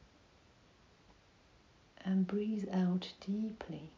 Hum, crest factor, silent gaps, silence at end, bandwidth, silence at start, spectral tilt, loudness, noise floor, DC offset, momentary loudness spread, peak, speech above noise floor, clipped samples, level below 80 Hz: none; 14 dB; none; 0.05 s; 7.2 kHz; 2 s; -8 dB/octave; -37 LUFS; -66 dBFS; under 0.1%; 9 LU; -26 dBFS; 29 dB; under 0.1%; -70 dBFS